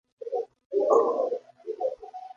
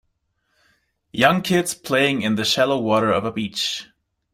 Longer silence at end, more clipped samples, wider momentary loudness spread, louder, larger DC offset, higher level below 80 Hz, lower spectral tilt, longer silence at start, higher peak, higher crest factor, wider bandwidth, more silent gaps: second, 0.05 s vs 0.5 s; neither; first, 14 LU vs 7 LU; second, -27 LUFS vs -20 LUFS; neither; second, -78 dBFS vs -58 dBFS; first, -6 dB/octave vs -4 dB/octave; second, 0.2 s vs 1.15 s; second, -8 dBFS vs -2 dBFS; about the same, 20 dB vs 20 dB; second, 7.4 kHz vs 16 kHz; first, 0.66-0.70 s vs none